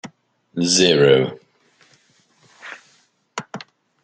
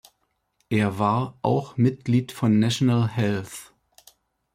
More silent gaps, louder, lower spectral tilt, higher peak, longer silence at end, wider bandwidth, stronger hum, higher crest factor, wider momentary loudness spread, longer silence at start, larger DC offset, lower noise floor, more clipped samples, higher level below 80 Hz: neither; first, -16 LUFS vs -23 LUFS; second, -3.5 dB/octave vs -6.5 dB/octave; first, -2 dBFS vs -8 dBFS; second, 0.45 s vs 0.9 s; second, 9.4 kHz vs 15.5 kHz; neither; about the same, 20 dB vs 16 dB; first, 25 LU vs 6 LU; second, 0.05 s vs 0.7 s; neither; second, -60 dBFS vs -73 dBFS; neither; about the same, -62 dBFS vs -60 dBFS